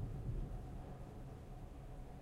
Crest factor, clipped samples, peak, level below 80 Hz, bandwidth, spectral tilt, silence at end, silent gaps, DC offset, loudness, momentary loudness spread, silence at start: 14 dB; under 0.1%; -34 dBFS; -50 dBFS; 13.5 kHz; -8 dB/octave; 0 s; none; under 0.1%; -51 LUFS; 8 LU; 0 s